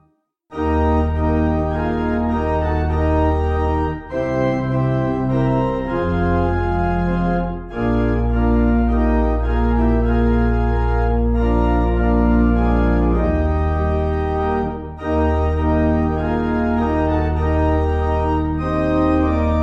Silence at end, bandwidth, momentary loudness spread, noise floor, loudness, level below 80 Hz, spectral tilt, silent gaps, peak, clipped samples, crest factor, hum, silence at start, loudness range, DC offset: 0 s; 6.6 kHz; 4 LU; -61 dBFS; -19 LUFS; -22 dBFS; -10 dB/octave; none; -4 dBFS; under 0.1%; 14 dB; none; 0.5 s; 2 LU; under 0.1%